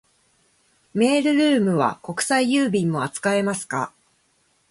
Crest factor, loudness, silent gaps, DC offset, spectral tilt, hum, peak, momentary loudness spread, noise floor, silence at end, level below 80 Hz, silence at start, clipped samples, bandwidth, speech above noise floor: 16 dB; -21 LUFS; none; under 0.1%; -4.5 dB/octave; none; -6 dBFS; 9 LU; -65 dBFS; 0.85 s; -64 dBFS; 0.95 s; under 0.1%; 11.5 kHz; 44 dB